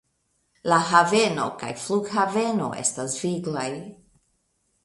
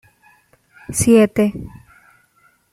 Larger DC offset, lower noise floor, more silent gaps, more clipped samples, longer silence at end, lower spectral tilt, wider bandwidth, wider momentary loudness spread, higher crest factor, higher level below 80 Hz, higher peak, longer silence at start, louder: neither; first, -71 dBFS vs -58 dBFS; neither; neither; second, 0.9 s vs 1.05 s; second, -3.5 dB/octave vs -5.5 dB/octave; second, 11.5 kHz vs 15.5 kHz; second, 14 LU vs 21 LU; about the same, 22 dB vs 18 dB; second, -64 dBFS vs -46 dBFS; about the same, -2 dBFS vs -2 dBFS; second, 0.65 s vs 0.9 s; second, -23 LUFS vs -15 LUFS